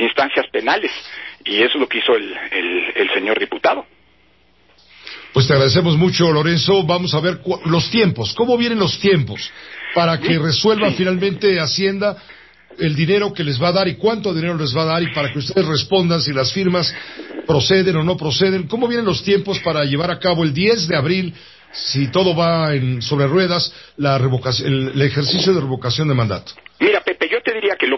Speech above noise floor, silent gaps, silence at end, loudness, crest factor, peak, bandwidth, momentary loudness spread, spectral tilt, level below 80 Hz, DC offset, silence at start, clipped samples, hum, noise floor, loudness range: 38 dB; none; 0 s; -17 LUFS; 16 dB; -2 dBFS; 6.2 kHz; 7 LU; -5.5 dB/octave; -48 dBFS; 0.1%; 0 s; under 0.1%; none; -55 dBFS; 2 LU